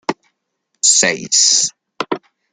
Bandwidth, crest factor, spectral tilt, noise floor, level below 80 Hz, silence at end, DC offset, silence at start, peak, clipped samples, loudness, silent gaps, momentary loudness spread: 12 kHz; 18 dB; 0 dB/octave; -71 dBFS; -68 dBFS; 0.35 s; under 0.1%; 0.1 s; 0 dBFS; under 0.1%; -13 LUFS; none; 16 LU